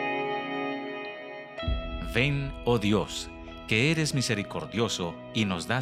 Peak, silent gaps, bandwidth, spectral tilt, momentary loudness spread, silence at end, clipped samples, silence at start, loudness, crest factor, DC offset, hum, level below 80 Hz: -8 dBFS; none; 16 kHz; -5 dB/octave; 12 LU; 0 s; under 0.1%; 0 s; -29 LUFS; 20 dB; under 0.1%; none; -42 dBFS